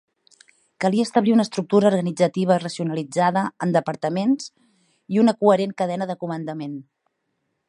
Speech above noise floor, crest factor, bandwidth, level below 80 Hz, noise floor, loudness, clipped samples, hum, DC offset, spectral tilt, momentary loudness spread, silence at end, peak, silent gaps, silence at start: 54 dB; 20 dB; 11 kHz; -72 dBFS; -74 dBFS; -21 LUFS; under 0.1%; none; under 0.1%; -6.5 dB/octave; 11 LU; 0.85 s; -2 dBFS; none; 0.8 s